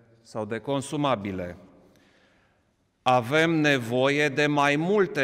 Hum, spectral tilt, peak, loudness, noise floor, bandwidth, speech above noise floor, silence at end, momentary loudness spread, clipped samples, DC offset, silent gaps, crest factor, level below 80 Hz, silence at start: none; -5.5 dB/octave; -10 dBFS; -24 LUFS; -69 dBFS; 15.5 kHz; 45 dB; 0 s; 13 LU; under 0.1%; under 0.1%; none; 16 dB; -66 dBFS; 0.35 s